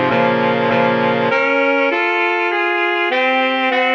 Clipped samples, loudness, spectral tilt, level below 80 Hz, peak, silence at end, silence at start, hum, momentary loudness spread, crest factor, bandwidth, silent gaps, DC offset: under 0.1%; -15 LUFS; -6 dB/octave; -64 dBFS; -2 dBFS; 0 s; 0 s; none; 1 LU; 14 dB; 7.2 kHz; none; under 0.1%